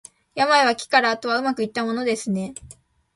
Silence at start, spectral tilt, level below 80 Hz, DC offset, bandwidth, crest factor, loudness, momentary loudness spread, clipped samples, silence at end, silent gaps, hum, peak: 0.35 s; -3.5 dB/octave; -60 dBFS; under 0.1%; 11.5 kHz; 20 dB; -21 LUFS; 14 LU; under 0.1%; 0.45 s; none; none; -2 dBFS